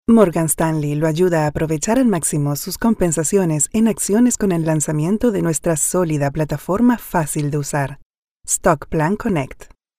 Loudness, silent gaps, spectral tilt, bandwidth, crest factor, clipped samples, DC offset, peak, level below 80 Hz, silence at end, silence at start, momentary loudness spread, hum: -18 LUFS; 8.05-8.11 s, 8.18-8.23 s, 8.31-8.36 s; -5.5 dB/octave; 16 kHz; 18 dB; under 0.1%; under 0.1%; 0 dBFS; -40 dBFS; 0.3 s; 0.1 s; 6 LU; none